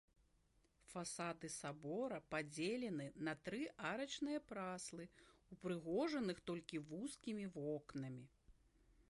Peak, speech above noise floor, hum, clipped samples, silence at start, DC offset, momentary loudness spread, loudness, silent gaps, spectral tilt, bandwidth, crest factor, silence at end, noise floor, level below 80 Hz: -30 dBFS; 31 dB; none; under 0.1%; 0.9 s; under 0.1%; 9 LU; -47 LUFS; none; -4.5 dB/octave; 11.5 kHz; 18 dB; 0.2 s; -78 dBFS; -76 dBFS